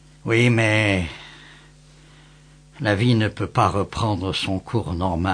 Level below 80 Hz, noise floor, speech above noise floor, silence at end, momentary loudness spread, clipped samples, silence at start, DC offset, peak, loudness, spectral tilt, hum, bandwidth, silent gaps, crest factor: -44 dBFS; -49 dBFS; 29 dB; 0 s; 9 LU; under 0.1%; 0.25 s; under 0.1%; -4 dBFS; -21 LUFS; -6 dB/octave; none; 10 kHz; none; 18 dB